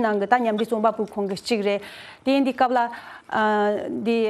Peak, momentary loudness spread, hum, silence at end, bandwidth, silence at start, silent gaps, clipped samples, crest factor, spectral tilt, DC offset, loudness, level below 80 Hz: -2 dBFS; 8 LU; none; 0 s; 13.5 kHz; 0 s; none; under 0.1%; 20 dB; -5.5 dB/octave; under 0.1%; -23 LUFS; -66 dBFS